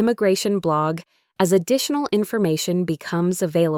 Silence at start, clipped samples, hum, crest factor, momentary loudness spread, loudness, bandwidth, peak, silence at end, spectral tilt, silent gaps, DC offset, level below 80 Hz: 0 s; under 0.1%; none; 14 dB; 5 LU; -21 LUFS; 18.5 kHz; -6 dBFS; 0 s; -5.5 dB/octave; none; under 0.1%; -62 dBFS